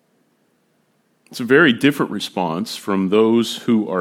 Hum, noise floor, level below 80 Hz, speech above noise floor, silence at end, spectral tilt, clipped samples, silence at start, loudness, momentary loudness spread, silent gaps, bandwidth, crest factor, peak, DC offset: none; -63 dBFS; -72 dBFS; 46 dB; 0 s; -5.5 dB/octave; under 0.1%; 1.3 s; -17 LUFS; 10 LU; none; 16.5 kHz; 18 dB; 0 dBFS; under 0.1%